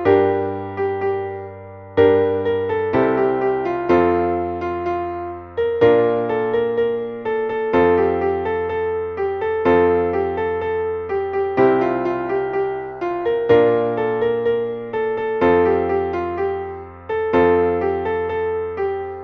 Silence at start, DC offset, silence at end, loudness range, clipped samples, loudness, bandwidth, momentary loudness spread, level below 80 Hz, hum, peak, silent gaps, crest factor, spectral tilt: 0 s; under 0.1%; 0 s; 2 LU; under 0.1%; -19 LUFS; 5.2 kHz; 9 LU; -48 dBFS; none; -2 dBFS; none; 16 dB; -8.5 dB/octave